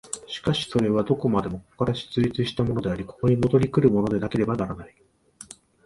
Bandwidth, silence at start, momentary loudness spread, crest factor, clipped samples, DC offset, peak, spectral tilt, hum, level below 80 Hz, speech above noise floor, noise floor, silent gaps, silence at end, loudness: 11.5 kHz; 0.05 s; 13 LU; 18 dB; under 0.1%; under 0.1%; -6 dBFS; -6.5 dB/octave; none; -48 dBFS; 24 dB; -47 dBFS; none; 0.4 s; -24 LUFS